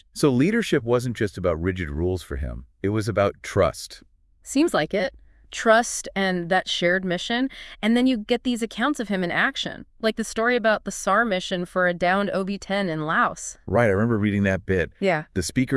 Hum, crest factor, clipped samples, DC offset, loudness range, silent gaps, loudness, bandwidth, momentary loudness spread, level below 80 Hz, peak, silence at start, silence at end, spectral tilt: none; 20 dB; under 0.1%; under 0.1%; 3 LU; none; -23 LUFS; 12 kHz; 7 LU; -46 dBFS; -4 dBFS; 0.15 s; 0 s; -5 dB/octave